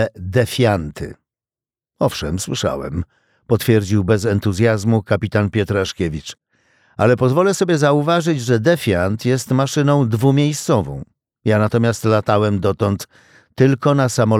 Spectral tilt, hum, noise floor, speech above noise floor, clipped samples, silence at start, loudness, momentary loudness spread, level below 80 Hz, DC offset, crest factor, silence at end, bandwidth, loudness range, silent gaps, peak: -6 dB/octave; none; under -90 dBFS; over 74 dB; under 0.1%; 0 s; -17 LUFS; 10 LU; -44 dBFS; under 0.1%; 14 dB; 0 s; 16 kHz; 5 LU; none; -2 dBFS